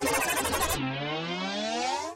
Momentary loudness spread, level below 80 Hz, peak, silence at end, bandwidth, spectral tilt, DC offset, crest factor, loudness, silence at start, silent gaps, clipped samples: 5 LU; -48 dBFS; -12 dBFS; 0 s; 16.5 kHz; -3 dB/octave; under 0.1%; 18 dB; -29 LUFS; 0 s; none; under 0.1%